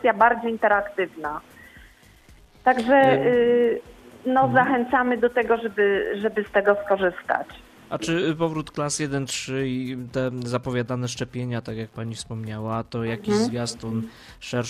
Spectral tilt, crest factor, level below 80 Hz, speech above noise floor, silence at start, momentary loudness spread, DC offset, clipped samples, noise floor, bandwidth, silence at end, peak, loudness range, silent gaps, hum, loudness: -5 dB/octave; 20 dB; -54 dBFS; 29 dB; 0 s; 13 LU; under 0.1%; under 0.1%; -51 dBFS; 14.5 kHz; 0 s; -4 dBFS; 8 LU; none; none; -23 LUFS